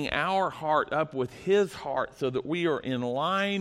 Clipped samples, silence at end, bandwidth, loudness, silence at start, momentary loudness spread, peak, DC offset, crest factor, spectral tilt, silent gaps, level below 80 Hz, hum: under 0.1%; 0 s; 13 kHz; -28 LUFS; 0 s; 6 LU; -12 dBFS; under 0.1%; 16 dB; -5.5 dB/octave; none; -58 dBFS; none